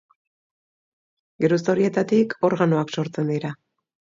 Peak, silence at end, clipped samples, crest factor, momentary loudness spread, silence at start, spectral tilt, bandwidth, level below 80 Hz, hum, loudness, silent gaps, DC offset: -6 dBFS; 0.65 s; under 0.1%; 18 dB; 8 LU; 1.4 s; -7 dB/octave; 7.6 kHz; -68 dBFS; none; -22 LUFS; none; under 0.1%